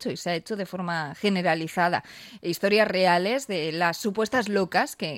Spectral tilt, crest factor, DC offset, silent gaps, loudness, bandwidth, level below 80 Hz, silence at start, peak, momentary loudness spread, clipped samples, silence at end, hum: -4.5 dB/octave; 18 dB; under 0.1%; none; -25 LUFS; 16.5 kHz; -68 dBFS; 0 s; -8 dBFS; 9 LU; under 0.1%; 0 s; none